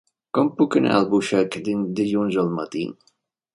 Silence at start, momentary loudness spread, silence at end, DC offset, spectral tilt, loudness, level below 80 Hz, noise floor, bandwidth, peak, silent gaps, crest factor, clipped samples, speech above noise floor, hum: 0.35 s; 9 LU; 0.6 s; under 0.1%; -6.5 dB/octave; -22 LUFS; -64 dBFS; -66 dBFS; 11.5 kHz; -4 dBFS; none; 18 dB; under 0.1%; 45 dB; none